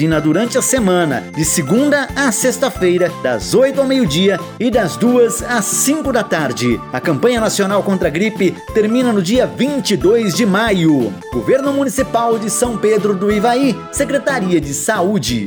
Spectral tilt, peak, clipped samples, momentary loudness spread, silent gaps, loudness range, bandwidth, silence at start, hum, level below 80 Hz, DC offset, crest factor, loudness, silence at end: -4.5 dB/octave; -2 dBFS; under 0.1%; 4 LU; none; 1 LU; over 20 kHz; 0 s; none; -38 dBFS; under 0.1%; 12 dB; -15 LUFS; 0 s